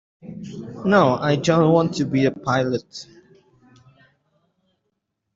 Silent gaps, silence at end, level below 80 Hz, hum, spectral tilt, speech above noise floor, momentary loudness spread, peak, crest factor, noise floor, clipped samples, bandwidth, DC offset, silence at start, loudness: none; 2.3 s; -58 dBFS; none; -6.5 dB/octave; 56 dB; 21 LU; -4 dBFS; 20 dB; -76 dBFS; under 0.1%; 7.8 kHz; under 0.1%; 0.25 s; -19 LUFS